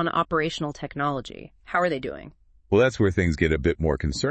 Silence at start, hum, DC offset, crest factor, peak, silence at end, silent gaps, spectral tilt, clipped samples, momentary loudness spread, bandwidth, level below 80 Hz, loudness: 0 s; none; under 0.1%; 18 dB; -6 dBFS; 0 s; none; -6 dB/octave; under 0.1%; 13 LU; 8.8 kHz; -40 dBFS; -24 LUFS